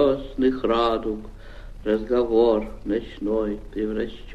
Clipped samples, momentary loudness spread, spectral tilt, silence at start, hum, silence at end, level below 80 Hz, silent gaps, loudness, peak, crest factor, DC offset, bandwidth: under 0.1%; 14 LU; -7.5 dB/octave; 0 s; none; 0 s; -40 dBFS; none; -24 LUFS; -8 dBFS; 16 dB; under 0.1%; 8 kHz